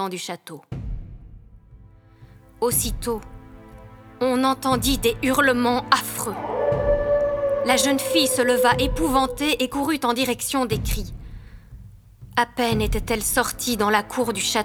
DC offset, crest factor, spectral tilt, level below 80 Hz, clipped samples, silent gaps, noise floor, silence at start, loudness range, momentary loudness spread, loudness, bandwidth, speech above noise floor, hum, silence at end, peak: under 0.1%; 22 dB; -3.5 dB/octave; -36 dBFS; under 0.1%; none; -48 dBFS; 0 s; 9 LU; 13 LU; -22 LUFS; over 20 kHz; 26 dB; none; 0 s; 0 dBFS